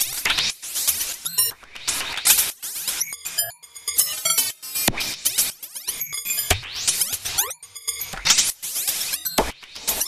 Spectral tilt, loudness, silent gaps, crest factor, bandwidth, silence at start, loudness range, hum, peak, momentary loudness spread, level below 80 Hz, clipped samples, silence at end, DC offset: 0 dB/octave; -21 LUFS; none; 22 dB; 16 kHz; 0 s; 2 LU; none; -4 dBFS; 10 LU; -46 dBFS; under 0.1%; 0 s; under 0.1%